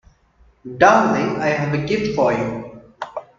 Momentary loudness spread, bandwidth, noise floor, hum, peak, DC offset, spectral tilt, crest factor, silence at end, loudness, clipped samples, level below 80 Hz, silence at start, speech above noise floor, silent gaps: 20 LU; 7.6 kHz; -55 dBFS; none; 0 dBFS; under 0.1%; -6 dB/octave; 20 dB; 0.15 s; -18 LUFS; under 0.1%; -50 dBFS; 0.65 s; 38 dB; none